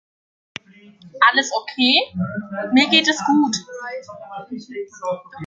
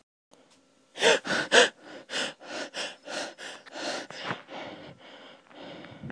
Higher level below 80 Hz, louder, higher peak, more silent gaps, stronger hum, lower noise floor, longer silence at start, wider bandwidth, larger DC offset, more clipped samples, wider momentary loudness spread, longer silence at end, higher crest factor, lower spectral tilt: first, -62 dBFS vs -76 dBFS; first, -18 LUFS vs -27 LUFS; about the same, -2 dBFS vs -4 dBFS; neither; neither; second, -47 dBFS vs -63 dBFS; about the same, 1.05 s vs 0.95 s; second, 9.2 kHz vs 10.5 kHz; neither; neither; second, 21 LU vs 26 LU; about the same, 0 s vs 0 s; second, 20 dB vs 26 dB; first, -3 dB/octave vs -1.5 dB/octave